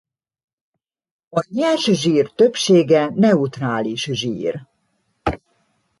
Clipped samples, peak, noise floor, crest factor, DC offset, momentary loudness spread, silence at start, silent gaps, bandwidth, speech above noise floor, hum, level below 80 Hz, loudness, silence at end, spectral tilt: under 0.1%; -2 dBFS; -68 dBFS; 16 dB; under 0.1%; 12 LU; 1.35 s; none; 11.5 kHz; 51 dB; none; -48 dBFS; -18 LUFS; 0.65 s; -5.5 dB/octave